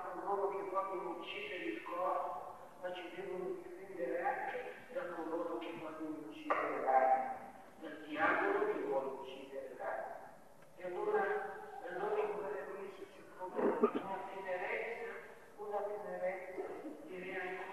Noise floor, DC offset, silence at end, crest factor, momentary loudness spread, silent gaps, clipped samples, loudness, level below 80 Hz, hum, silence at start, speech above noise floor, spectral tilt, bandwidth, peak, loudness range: -60 dBFS; under 0.1%; 0 s; 22 dB; 15 LU; none; under 0.1%; -40 LUFS; -80 dBFS; none; 0 s; 21 dB; -5.5 dB/octave; 13 kHz; -18 dBFS; 6 LU